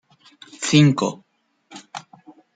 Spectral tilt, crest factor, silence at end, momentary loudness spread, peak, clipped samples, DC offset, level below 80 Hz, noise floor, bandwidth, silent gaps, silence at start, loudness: -5 dB/octave; 20 dB; 0.55 s; 23 LU; -2 dBFS; under 0.1%; under 0.1%; -62 dBFS; -51 dBFS; 9.4 kHz; none; 0.6 s; -18 LUFS